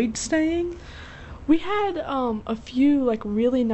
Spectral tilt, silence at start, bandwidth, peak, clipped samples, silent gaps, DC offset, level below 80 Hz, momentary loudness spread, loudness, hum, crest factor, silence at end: -5 dB/octave; 0 s; 8.2 kHz; -8 dBFS; under 0.1%; none; under 0.1%; -46 dBFS; 17 LU; -23 LUFS; none; 16 dB; 0 s